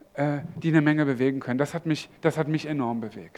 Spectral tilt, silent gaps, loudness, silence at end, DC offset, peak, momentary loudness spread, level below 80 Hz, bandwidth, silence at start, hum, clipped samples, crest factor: -7 dB/octave; none; -26 LUFS; 0.1 s; under 0.1%; -6 dBFS; 7 LU; -66 dBFS; 13 kHz; 0.15 s; none; under 0.1%; 20 dB